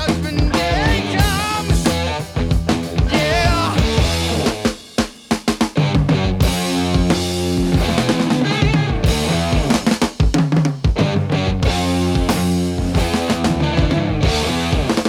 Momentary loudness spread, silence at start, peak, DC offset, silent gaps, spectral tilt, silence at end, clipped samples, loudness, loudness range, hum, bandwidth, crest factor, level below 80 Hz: 3 LU; 0 s; -2 dBFS; under 0.1%; none; -5.5 dB/octave; 0 s; under 0.1%; -17 LUFS; 1 LU; none; 17.5 kHz; 14 dB; -24 dBFS